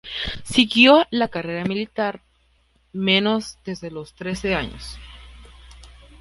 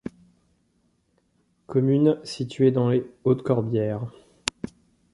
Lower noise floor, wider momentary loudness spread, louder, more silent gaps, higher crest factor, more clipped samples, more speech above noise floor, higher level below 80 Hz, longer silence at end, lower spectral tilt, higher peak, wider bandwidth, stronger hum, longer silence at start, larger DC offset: second, -61 dBFS vs -68 dBFS; first, 22 LU vs 16 LU; first, -19 LUFS vs -24 LUFS; neither; about the same, 22 dB vs 26 dB; neither; second, 41 dB vs 45 dB; first, -44 dBFS vs -60 dBFS; second, 0.35 s vs 1.05 s; second, -4.5 dB/octave vs -7 dB/octave; about the same, -2 dBFS vs 0 dBFS; about the same, 11.5 kHz vs 11.5 kHz; neither; about the same, 0.05 s vs 0.05 s; neither